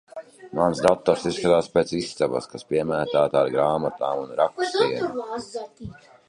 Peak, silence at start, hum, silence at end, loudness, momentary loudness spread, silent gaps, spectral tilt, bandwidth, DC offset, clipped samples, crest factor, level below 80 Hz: -4 dBFS; 0.15 s; none; 0.35 s; -23 LUFS; 15 LU; none; -5.5 dB/octave; 11.5 kHz; under 0.1%; under 0.1%; 20 dB; -56 dBFS